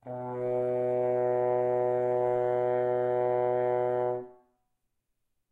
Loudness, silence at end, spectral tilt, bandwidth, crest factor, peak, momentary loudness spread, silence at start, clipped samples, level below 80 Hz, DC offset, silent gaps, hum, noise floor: -29 LUFS; 1.2 s; -9.5 dB/octave; 3.8 kHz; 12 dB; -16 dBFS; 4 LU; 0.05 s; under 0.1%; -76 dBFS; under 0.1%; none; none; -79 dBFS